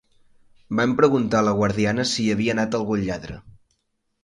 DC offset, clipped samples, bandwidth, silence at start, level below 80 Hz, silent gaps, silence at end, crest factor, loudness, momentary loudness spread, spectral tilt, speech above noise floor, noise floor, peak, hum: under 0.1%; under 0.1%; 11.5 kHz; 0.7 s; -50 dBFS; none; 0.75 s; 18 dB; -21 LUFS; 11 LU; -5.5 dB/octave; 52 dB; -73 dBFS; -4 dBFS; none